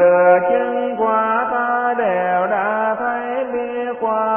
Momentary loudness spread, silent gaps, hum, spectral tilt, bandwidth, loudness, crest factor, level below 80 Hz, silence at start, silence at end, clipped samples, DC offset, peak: 9 LU; none; none; -10 dB/octave; 3.4 kHz; -18 LUFS; 14 dB; -58 dBFS; 0 s; 0 s; under 0.1%; under 0.1%; -2 dBFS